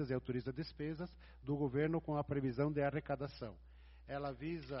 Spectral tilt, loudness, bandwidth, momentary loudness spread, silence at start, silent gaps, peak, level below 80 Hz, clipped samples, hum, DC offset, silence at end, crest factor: -7 dB/octave; -41 LUFS; 5.8 kHz; 14 LU; 0 s; none; -24 dBFS; -60 dBFS; under 0.1%; none; under 0.1%; 0 s; 18 dB